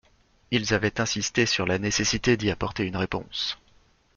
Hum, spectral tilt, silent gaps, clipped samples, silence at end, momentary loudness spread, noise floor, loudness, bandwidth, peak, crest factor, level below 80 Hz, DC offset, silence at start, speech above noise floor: none; -3.5 dB/octave; none; under 0.1%; 0.6 s; 6 LU; -60 dBFS; -25 LUFS; 7.4 kHz; -8 dBFS; 18 dB; -48 dBFS; under 0.1%; 0.5 s; 35 dB